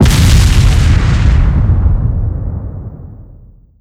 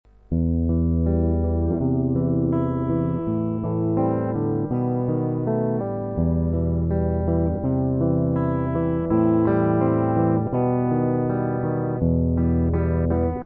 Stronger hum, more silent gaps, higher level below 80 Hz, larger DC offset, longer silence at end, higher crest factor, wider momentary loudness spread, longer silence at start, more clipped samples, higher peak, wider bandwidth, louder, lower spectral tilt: neither; neither; first, -12 dBFS vs -34 dBFS; neither; first, 0.45 s vs 0 s; second, 8 dB vs 14 dB; first, 17 LU vs 4 LU; second, 0 s vs 0.3 s; neither; first, -2 dBFS vs -8 dBFS; first, 15.5 kHz vs 3.2 kHz; first, -11 LUFS vs -22 LUFS; second, -5.5 dB/octave vs -14 dB/octave